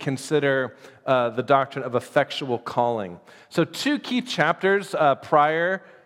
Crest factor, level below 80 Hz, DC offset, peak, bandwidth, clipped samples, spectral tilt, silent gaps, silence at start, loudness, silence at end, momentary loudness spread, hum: 20 dB; -74 dBFS; under 0.1%; -4 dBFS; 16 kHz; under 0.1%; -5 dB/octave; none; 0 s; -23 LUFS; 0.25 s; 8 LU; none